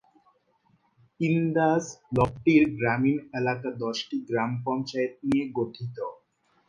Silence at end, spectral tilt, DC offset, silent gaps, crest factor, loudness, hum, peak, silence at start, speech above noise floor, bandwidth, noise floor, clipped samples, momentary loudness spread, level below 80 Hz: 0.55 s; -6.5 dB/octave; under 0.1%; none; 18 dB; -27 LUFS; none; -8 dBFS; 1.2 s; 42 dB; 9.8 kHz; -68 dBFS; under 0.1%; 10 LU; -56 dBFS